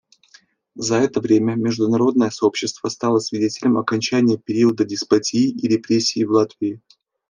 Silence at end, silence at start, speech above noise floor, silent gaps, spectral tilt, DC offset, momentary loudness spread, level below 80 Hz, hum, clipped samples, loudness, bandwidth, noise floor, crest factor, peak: 0.5 s; 0.75 s; 35 dB; none; -5 dB/octave; under 0.1%; 6 LU; -64 dBFS; none; under 0.1%; -19 LUFS; 10 kHz; -53 dBFS; 16 dB; -2 dBFS